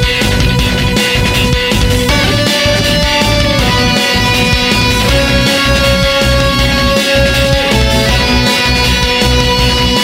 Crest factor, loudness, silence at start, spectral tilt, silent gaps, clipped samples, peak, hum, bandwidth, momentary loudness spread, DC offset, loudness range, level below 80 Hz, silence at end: 10 dB; -10 LUFS; 0 s; -4 dB/octave; none; under 0.1%; 0 dBFS; none; 16.5 kHz; 2 LU; under 0.1%; 1 LU; -18 dBFS; 0 s